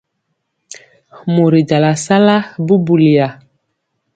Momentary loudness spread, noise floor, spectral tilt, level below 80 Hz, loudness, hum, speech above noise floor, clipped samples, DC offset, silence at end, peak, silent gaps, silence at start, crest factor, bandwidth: 6 LU; -70 dBFS; -6.5 dB/octave; -56 dBFS; -12 LUFS; none; 58 dB; under 0.1%; under 0.1%; 0.85 s; 0 dBFS; none; 1.15 s; 14 dB; 9.2 kHz